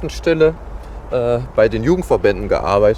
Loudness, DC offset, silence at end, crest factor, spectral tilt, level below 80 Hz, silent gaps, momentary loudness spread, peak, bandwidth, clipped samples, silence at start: -16 LUFS; under 0.1%; 0 s; 14 dB; -7 dB/octave; -30 dBFS; none; 13 LU; -2 dBFS; 13 kHz; under 0.1%; 0 s